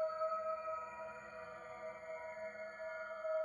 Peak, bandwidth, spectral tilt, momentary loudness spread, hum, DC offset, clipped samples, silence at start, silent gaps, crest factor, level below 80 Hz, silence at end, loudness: -30 dBFS; 11 kHz; -4 dB/octave; 11 LU; none; under 0.1%; under 0.1%; 0 s; none; 14 dB; -80 dBFS; 0 s; -45 LUFS